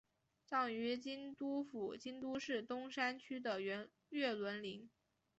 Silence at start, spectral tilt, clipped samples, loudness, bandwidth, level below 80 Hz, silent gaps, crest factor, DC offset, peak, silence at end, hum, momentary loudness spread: 0.5 s; -2 dB/octave; under 0.1%; -43 LUFS; 8 kHz; -84 dBFS; none; 20 dB; under 0.1%; -26 dBFS; 0.5 s; none; 8 LU